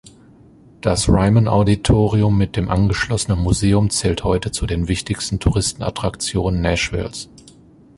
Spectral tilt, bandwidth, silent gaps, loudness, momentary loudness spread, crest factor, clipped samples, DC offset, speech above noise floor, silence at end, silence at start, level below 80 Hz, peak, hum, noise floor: -5.5 dB/octave; 11.5 kHz; none; -18 LUFS; 8 LU; 16 dB; under 0.1%; under 0.1%; 29 dB; 0.75 s; 0.05 s; -30 dBFS; -2 dBFS; none; -47 dBFS